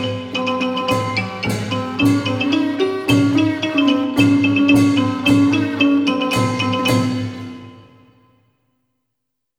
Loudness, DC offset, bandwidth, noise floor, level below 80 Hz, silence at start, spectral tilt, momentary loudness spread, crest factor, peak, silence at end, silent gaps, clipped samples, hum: -17 LUFS; under 0.1%; 16 kHz; -78 dBFS; -52 dBFS; 0 s; -5.5 dB/octave; 8 LU; 16 dB; -2 dBFS; 1.75 s; none; under 0.1%; none